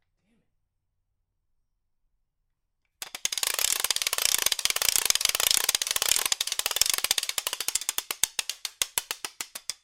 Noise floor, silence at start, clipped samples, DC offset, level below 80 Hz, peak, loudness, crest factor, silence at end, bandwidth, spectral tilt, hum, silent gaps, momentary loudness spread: -78 dBFS; 3 s; under 0.1%; under 0.1%; -60 dBFS; 0 dBFS; -25 LUFS; 30 dB; 0.1 s; 17 kHz; 2.5 dB/octave; none; none; 12 LU